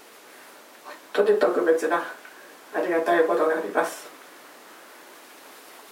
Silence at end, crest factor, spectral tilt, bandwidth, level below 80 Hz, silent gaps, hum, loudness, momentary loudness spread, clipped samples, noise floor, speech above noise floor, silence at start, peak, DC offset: 0.15 s; 20 dB; -4 dB/octave; 16.5 kHz; under -90 dBFS; none; none; -23 LUFS; 25 LU; under 0.1%; -48 dBFS; 25 dB; 0.35 s; -6 dBFS; under 0.1%